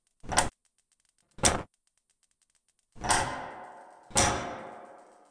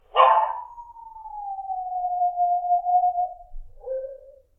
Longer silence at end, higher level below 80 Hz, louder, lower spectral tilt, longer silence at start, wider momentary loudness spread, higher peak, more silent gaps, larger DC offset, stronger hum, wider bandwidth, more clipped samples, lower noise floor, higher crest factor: about the same, 0.3 s vs 0.25 s; about the same, -48 dBFS vs -48 dBFS; second, -29 LUFS vs -23 LUFS; second, -2 dB/octave vs -3.5 dB/octave; about the same, 0.25 s vs 0.15 s; second, 20 LU vs 24 LU; about the same, -4 dBFS vs -2 dBFS; neither; neither; neither; first, 10.5 kHz vs 3.8 kHz; neither; first, -74 dBFS vs -45 dBFS; first, 30 dB vs 22 dB